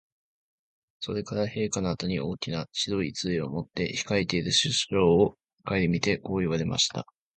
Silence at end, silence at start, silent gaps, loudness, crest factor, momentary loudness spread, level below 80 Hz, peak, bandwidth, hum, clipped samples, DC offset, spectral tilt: 0.35 s; 1 s; 5.53-5.58 s; -27 LUFS; 20 dB; 9 LU; -52 dBFS; -8 dBFS; 9.2 kHz; none; under 0.1%; under 0.1%; -4.5 dB/octave